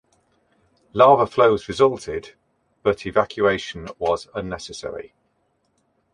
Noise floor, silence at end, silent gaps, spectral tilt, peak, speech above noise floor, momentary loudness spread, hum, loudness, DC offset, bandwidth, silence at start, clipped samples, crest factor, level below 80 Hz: -68 dBFS; 1.1 s; none; -5.5 dB/octave; -2 dBFS; 48 dB; 17 LU; none; -20 LUFS; under 0.1%; 10.5 kHz; 0.95 s; under 0.1%; 20 dB; -52 dBFS